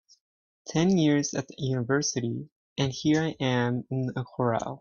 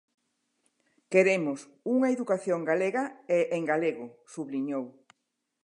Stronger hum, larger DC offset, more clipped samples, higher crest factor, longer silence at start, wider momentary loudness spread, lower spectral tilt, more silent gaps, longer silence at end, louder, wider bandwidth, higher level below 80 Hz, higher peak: neither; neither; neither; about the same, 16 dB vs 20 dB; second, 0.65 s vs 1.1 s; second, 9 LU vs 13 LU; about the same, -5.5 dB/octave vs -6 dB/octave; first, 2.52-2.76 s vs none; second, 0.05 s vs 0.75 s; about the same, -27 LUFS vs -28 LUFS; second, 7.4 kHz vs 11 kHz; first, -62 dBFS vs -86 dBFS; about the same, -10 dBFS vs -10 dBFS